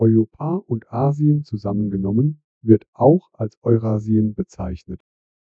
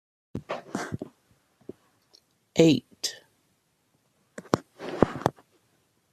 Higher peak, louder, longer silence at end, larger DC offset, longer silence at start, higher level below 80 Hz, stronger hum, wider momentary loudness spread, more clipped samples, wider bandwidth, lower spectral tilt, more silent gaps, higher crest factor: about the same, 0 dBFS vs 0 dBFS; first, -20 LUFS vs -28 LUFS; second, 0.5 s vs 0.8 s; neither; second, 0 s vs 0.35 s; first, -46 dBFS vs -58 dBFS; neither; second, 13 LU vs 27 LU; neither; second, 7 kHz vs 14.5 kHz; first, -11.5 dB/octave vs -5.5 dB/octave; first, 2.44-2.61 s, 2.88-2.93 s, 3.57-3.62 s vs none; second, 20 dB vs 30 dB